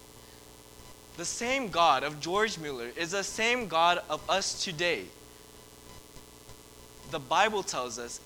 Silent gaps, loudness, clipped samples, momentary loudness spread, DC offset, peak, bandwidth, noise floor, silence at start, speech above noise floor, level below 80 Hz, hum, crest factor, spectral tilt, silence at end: none; -29 LUFS; under 0.1%; 25 LU; under 0.1%; -10 dBFS; over 20 kHz; -52 dBFS; 0 s; 22 dB; -58 dBFS; 60 Hz at -60 dBFS; 22 dB; -2 dB/octave; 0 s